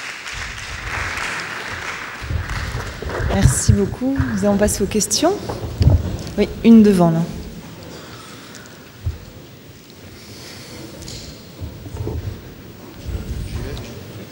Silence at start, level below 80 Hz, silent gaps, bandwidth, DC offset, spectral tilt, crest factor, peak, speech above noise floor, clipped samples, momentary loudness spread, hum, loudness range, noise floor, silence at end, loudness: 0 s; -32 dBFS; none; 16.5 kHz; under 0.1%; -5.5 dB/octave; 20 dB; 0 dBFS; 26 dB; under 0.1%; 21 LU; none; 18 LU; -40 dBFS; 0 s; -19 LUFS